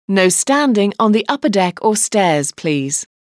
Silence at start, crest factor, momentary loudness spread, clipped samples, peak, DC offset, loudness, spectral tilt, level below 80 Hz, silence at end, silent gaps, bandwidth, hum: 0.1 s; 14 dB; 5 LU; under 0.1%; 0 dBFS; under 0.1%; -15 LUFS; -4 dB/octave; -68 dBFS; 0.2 s; none; 11 kHz; none